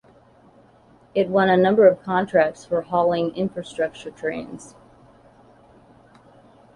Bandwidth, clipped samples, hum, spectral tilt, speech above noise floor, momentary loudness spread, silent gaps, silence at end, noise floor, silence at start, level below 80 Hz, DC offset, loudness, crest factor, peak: 10.5 kHz; under 0.1%; none; -6.5 dB/octave; 33 dB; 13 LU; none; 2.1 s; -53 dBFS; 1.15 s; -60 dBFS; under 0.1%; -21 LUFS; 20 dB; -2 dBFS